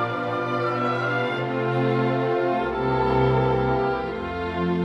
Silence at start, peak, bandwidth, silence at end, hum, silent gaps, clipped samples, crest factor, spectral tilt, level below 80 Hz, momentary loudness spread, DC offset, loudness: 0 s; -10 dBFS; 7.2 kHz; 0 s; none; none; under 0.1%; 14 dB; -8 dB/octave; -44 dBFS; 6 LU; under 0.1%; -23 LUFS